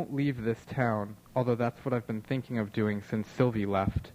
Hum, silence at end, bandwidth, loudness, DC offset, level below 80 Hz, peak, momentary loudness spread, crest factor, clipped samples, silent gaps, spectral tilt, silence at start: none; 0 s; 15.5 kHz; -31 LUFS; under 0.1%; -52 dBFS; -12 dBFS; 5 LU; 18 dB; under 0.1%; none; -8.5 dB/octave; 0 s